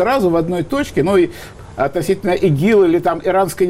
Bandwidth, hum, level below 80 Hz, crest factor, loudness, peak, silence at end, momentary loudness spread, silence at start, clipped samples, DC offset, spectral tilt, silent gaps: 16 kHz; none; -42 dBFS; 10 dB; -16 LUFS; -4 dBFS; 0 s; 8 LU; 0 s; under 0.1%; under 0.1%; -6.5 dB/octave; none